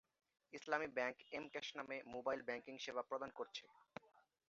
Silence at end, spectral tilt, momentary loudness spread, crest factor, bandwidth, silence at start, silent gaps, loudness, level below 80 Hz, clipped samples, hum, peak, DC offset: 0.3 s; -1 dB/octave; 16 LU; 24 dB; 7.4 kHz; 0.5 s; none; -47 LUFS; -86 dBFS; under 0.1%; none; -24 dBFS; under 0.1%